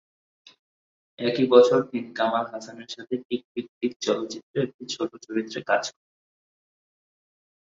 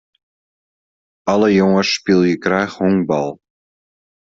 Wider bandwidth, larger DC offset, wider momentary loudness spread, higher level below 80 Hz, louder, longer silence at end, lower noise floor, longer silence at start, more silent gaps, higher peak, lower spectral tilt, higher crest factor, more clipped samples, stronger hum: about the same, 7.6 kHz vs 7.6 kHz; neither; first, 17 LU vs 7 LU; second, -74 dBFS vs -56 dBFS; second, -25 LUFS vs -16 LUFS; first, 1.75 s vs 0.85 s; about the same, under -90 dBFS vs under -90 dBFS; about the same, 1.2 s vs 1.25 s; first, 3.25-3.29 s, 3.44-3.55 s, 3.69-3.81 s, 3.96-4.00 s, 4.43-4.54 s, 4.74-4.79 s vs none; about the same, -2 dBFS vs -2 dBFS; second, -4.5 dB/octave vs -6 dB/octave; first, 24 dB vs 16 dB; neither; neither